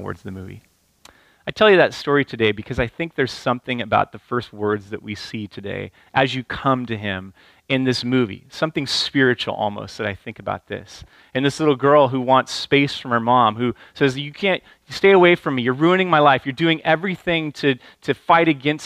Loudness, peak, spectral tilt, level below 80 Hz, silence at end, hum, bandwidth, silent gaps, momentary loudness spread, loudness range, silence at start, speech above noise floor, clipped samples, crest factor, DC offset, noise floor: -19 LUFS; -2 dBFS; -5.5 dB/octave; -50 dBFS; 0 s; none; 13.5 kHz; none; 15 LU; 7 LU; 0 s; 32 dB; under 0.1%; 18 dB; under 0.1%; -52 dBFS